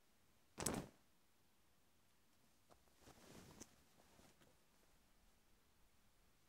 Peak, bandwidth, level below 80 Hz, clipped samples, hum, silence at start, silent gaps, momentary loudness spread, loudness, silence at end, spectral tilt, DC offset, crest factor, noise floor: -22 dBFS; 16 kHz; -76 dBFS; under 0.1%; none; 0.55 s; none; 22 LU; -49 LUFS; 0.3 s; -3.5 dB/octave; under 0.1%; 38 dB; -79 dBFS